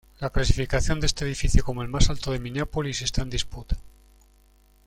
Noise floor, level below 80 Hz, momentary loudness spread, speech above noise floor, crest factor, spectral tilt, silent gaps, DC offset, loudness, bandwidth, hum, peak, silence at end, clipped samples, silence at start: -58 dBFS; -28 dBFS; 7 LU; 34 dB; 22 dB; -4.5 dB/octave; none; under 0.1%; -27 LUFS; 12.5 kHz; 50 Hz at -45 dBFS; -2 dBFS; 1 s; under 0.1%; 0.2 s